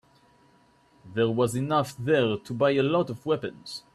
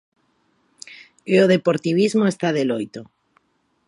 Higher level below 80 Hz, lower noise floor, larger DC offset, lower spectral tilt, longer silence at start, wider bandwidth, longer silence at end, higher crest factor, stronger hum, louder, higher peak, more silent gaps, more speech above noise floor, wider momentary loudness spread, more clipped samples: first, -64 dBFS vs -70 dBFS; second, -61 dBFS vs -65 dBFS; neither; about the same, -6 dB/octave vs -6 dB/octave; first, 1.05 s vs 0.9 s; first, 13.5 kHz vs 11.5 kHz; second, 0.15 s vs 0.85 s; about the same, 16 dB vs 18 dB; neither; second, -26 LUFS vs -19 LUFS; second, -10 dBFS vs -4 dBFS; neither; second, 35 dB vs 47 dB; second, 8 LU vs 24 LU; neither